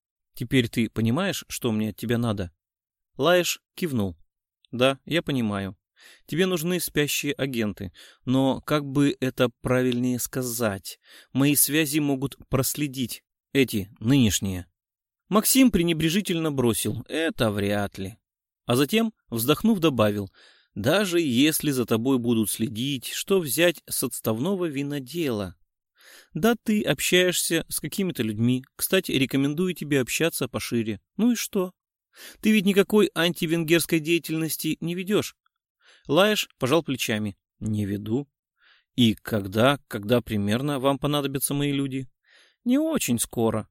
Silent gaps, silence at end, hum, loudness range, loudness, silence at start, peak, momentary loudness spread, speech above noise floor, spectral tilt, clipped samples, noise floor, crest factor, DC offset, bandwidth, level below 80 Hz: 35.70-35.75 s, 38.39-38.43 s; 0.05 s; none; 3 LU; -24 LUFS; 0.35 s; -6 dBFS; 11 LU; 39 dB; -4.5 dB/octave; under 0.1%; -63 dBFS; 20 dB; under 0.1%; 16.5 kHz; -54 dBFS